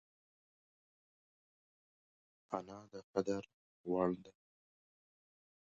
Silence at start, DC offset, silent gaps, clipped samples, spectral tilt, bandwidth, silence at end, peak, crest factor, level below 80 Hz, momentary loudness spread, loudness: 2.5 s; under 0.1%; 3.04-3.14 s, 3.54-3.84 s; under 0.1%; -7 dB/octave; 7.6 kHz; 1.35 s; -20 dBFS; 26 dB; -76 dBFS; 15 LU; -41 LUFS